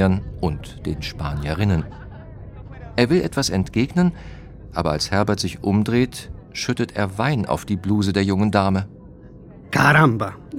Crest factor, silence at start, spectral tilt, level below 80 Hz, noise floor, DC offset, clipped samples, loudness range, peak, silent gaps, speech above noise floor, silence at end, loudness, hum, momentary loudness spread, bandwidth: 20 dB; 0 s; -6 dB/octave; -38 dBFS; -41 dBFS; under 0.1%; under 0.1%; 4 LU; -2 dBFS; none; 21 dB; 0 s; -21 LUFS; none; 18 LU; 16 kHz